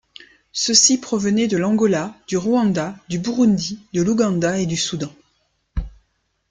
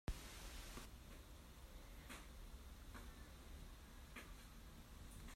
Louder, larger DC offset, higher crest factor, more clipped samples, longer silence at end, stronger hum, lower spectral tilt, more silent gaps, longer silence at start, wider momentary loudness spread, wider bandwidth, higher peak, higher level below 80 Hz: first, -19 LUFS vs -58 LUFS; neither; about the same, 20 dB vs 22 dB; neither; first, 0.6 s vs 0 s; neither; about the same, -4 dB/octave vs -4 dB/octave; neither; first, 0.55 s vs 0.05 s; first, 17 LU vs 6 LU; second, 9.6 kHz vs 16 kHz; first, 0 dBFS vs -34 dBFS; first, -42 dBFS vs -58 dBFS